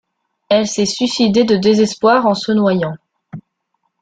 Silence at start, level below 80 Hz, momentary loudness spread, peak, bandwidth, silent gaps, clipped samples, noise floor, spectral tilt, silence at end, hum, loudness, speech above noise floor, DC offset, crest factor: 0.5 s; -56 dBFS; 6 LU; -2 dBFS; 9.4 kHz; none; under 0.1%; -69 dBFS; -5 dB/octave; 0.6 s; none; -14 LUFS; 56 dB; under 0.1%; 14 dB